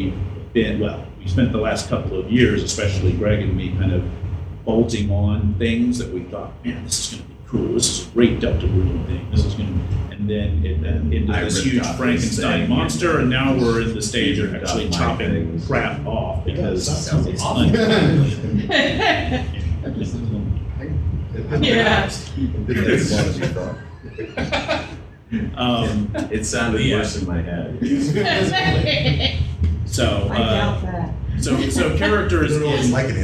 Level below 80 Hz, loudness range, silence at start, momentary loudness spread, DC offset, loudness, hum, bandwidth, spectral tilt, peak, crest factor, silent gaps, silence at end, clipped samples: -30 dBFS; 3 LU; 0 s; 8 LU; under 0.1%; -20 LUFS; none; 13.5 kHz; -5 dB/octave; -2 dBFS; 18 dB; none; 0 s; under 0.1%